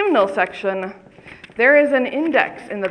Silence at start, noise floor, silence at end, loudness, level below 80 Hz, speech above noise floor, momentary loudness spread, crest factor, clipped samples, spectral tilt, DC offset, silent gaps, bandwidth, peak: 0 s; -42 dBFS; 0 s; -17 LUFS; -62 dBFS; 24 dB; 14 LU; 18 dB; under 0.1%; -6 dB/octave; under 0.1%; none; 9.8 kHz; 0 dBFS